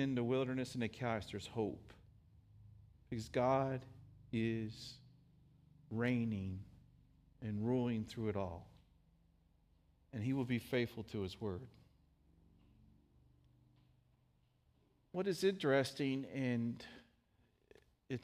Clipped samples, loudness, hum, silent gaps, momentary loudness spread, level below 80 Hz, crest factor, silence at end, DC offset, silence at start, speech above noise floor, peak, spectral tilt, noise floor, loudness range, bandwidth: under 0.1%; -40 LUFS; none; none; 16 LU; -70 dBFS; 20 dB; 0 s; under 0.1%; 0 s; 37 dB; -22 dBFS; -6.5 dB/octave; -75 dBFS; 5 LU; 15 kHz